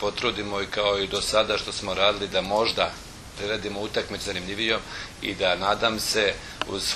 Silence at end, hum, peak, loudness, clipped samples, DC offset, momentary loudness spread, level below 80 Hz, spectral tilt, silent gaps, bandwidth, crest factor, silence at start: 0 s; none; -4 dBFS; -25 LUFS; under 0.1%; under 0.1%; 9 LU; -48 dBFS; -2.5 dB/octave; none; 13.5 kHz; 22 dB; 0 s